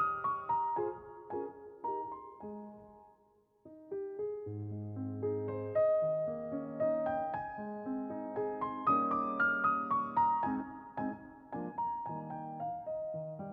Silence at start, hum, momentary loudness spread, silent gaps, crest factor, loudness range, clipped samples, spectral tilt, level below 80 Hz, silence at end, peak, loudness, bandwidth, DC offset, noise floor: 0 s; none; 14 LU; none; 16 dB; 11 LU; under 0.1%; -7 dB/octave; -72 dBFS; 0 s; -20 dBFS; -36 LUFS; 5.2 kHz; under 0.1%; -70 dBFS